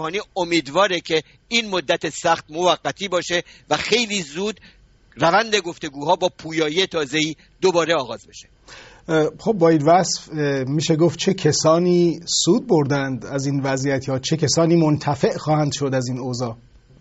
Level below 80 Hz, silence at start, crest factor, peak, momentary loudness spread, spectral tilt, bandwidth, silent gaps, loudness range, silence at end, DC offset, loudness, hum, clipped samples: -54 dBFS; 0 s; 18 dB; -2 dBFS; 9 LU; -4.5 dB/octave; 8.2 kHz; none; 4 LU; 0.45 s; under 0.1%; -20 LUFS; none; under 0.1%